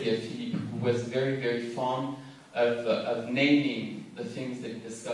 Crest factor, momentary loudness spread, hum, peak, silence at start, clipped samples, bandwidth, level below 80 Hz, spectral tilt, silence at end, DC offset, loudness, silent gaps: 18 dB; 14 LU; none; -12 dBFS; 0 s; under 0.1%; 11.5 kHz; -74 dBFS; -6 dB/octave; 0 s; under 0.1%; -30 LUFS; none